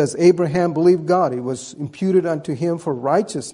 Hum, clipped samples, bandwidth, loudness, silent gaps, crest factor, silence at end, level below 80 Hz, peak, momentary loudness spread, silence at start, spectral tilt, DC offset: none; under 0.1%; 11 kHz; -19 LUFS; none; 16 dB; 0 s; -60 dBFS; -2 dBFS; 10 LU; 0 s; -6.5 dB/octave; under 0.1%